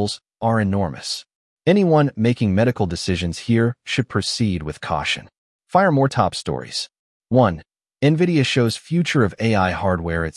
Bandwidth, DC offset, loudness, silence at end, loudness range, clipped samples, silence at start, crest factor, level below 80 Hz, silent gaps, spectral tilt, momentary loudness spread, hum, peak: 12 kHz; under 0.1%; -20 LUFS; 0.05 s; 2 LU; under 0.1%; 0 s; 16 dB; -48 dBFS; 1.35-1.57 s, 5.38-5.59 s, 6.99-7.20 s; -6 dB/octave; 9 LU; none; -4 dBFS